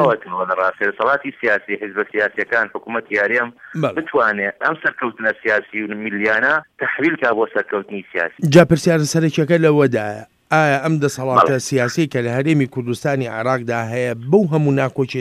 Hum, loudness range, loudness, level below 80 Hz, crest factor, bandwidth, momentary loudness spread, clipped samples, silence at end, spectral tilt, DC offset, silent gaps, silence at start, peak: none; 3 LU; -18 LUFS; -58 dBFS; 18 dB; 15 kHz; 8 LU; under 0.1%; 0 s; -6 dB/octave; under 0.1%; none; 0 s; 0 dBFS